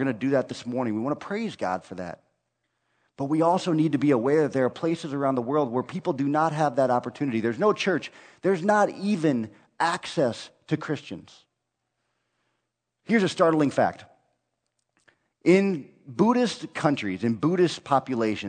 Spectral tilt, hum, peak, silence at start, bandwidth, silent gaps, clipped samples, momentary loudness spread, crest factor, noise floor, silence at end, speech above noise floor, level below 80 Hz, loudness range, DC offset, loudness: -6.5 dB/octave; none; -6 dBFS; 0 s; 9.4 kHz; none; under 0.1%; 10 LU; 20 dB; -80 dBFS; 0 s; 56 dB; -70 dBFS; 6 LU; under 0.1%; -25 LUFS